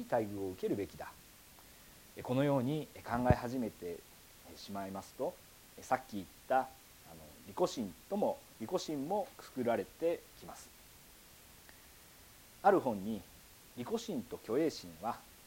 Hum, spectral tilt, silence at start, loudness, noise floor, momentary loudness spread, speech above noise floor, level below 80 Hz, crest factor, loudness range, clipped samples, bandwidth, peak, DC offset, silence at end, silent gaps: none; -6 dB/octave; 0 s; -37 LUFS; -59 dBFS; 24 LU; 22 dB; -60 dBFS; 26 dB; 4 LU; under 0.1%; 17 kHz; -14 dBFS; under 0.1%; 0 s; none